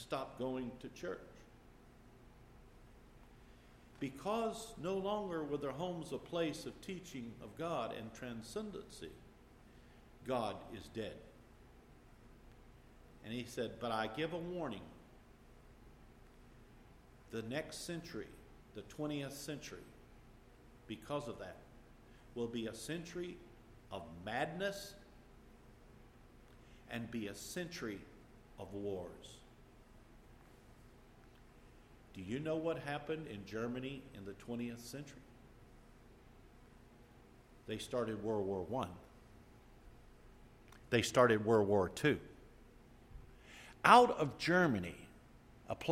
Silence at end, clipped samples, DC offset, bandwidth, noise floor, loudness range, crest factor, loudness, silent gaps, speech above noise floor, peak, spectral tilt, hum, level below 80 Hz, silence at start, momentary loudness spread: 0 s; under 0.1%; under 0.1%; 16 kHz; -62 dBFS; 15 LU; 30 dB; -39 LUFS; none; 23 dB; -10 dBFS; -5 dB/octave; none; -64 dBFS; 0 s; 23 LU